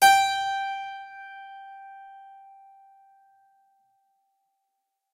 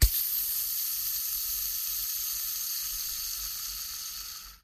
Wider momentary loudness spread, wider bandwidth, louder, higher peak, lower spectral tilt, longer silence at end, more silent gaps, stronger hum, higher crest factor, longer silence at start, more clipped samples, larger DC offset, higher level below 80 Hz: first, 26 LU vs 8 LU; about the same, 16 kHz vs 15.5 kHz; first, -25 LUFS vs -30 LUFS; about the same, -6 dBFS vs -8 dBFS; second, 1.5 dB/octave vs -0.5 dB/octave; first, 2.95 s vs 0.05 s; neither; neither; about the same, 22 dB vs 22 dB; about the same, 0 s vs 0 s; neither; neither; second, -74 dBFS vs -38 dBFS